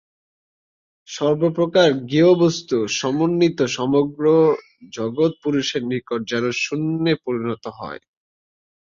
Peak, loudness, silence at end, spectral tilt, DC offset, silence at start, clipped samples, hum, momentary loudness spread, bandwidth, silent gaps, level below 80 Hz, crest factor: -4 dBFS; -19 LUFS; 0.95 s; -5.5 dB/octave; under 0.1%; 1.1 s; under 0.1%; none; 12 LU; 7.6 kHz; none; -62 dBFS; 18 dB